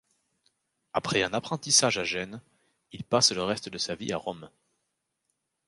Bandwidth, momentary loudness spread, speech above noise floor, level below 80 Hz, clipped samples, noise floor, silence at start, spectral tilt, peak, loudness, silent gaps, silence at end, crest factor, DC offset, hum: 11.5 kHz; 18 LU; 52 dB; -64 dBFS; under 0.1%; -81 dBFS; 0.95 s; -2 dB/octave; -8 dBFS; -26 LUFS; none; 1.2 s; 24 dB; under 0.1%; none